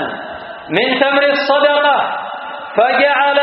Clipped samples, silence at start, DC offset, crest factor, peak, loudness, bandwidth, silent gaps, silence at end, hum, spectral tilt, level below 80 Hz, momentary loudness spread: under 0.1%; 0 s; under 0.1%; 14 dB; 0 dBFS; -13 LUFS; 5.8 kHz; none; 0 s; none; 0 dB/octave; -62 dBFS; 15 LU